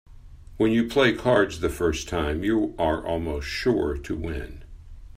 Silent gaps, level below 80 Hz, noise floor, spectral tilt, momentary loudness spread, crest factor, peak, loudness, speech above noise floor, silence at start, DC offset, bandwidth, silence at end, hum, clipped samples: none; -40 dBFS; -44 dBFS; -5.5 dB/octave; 10 LU; 20 dB; -6 dBFS; -24 LUFS; 20 dB; 0.1 s; under 0.1%; 15.5 kHz; 0 s; none; under 0.1%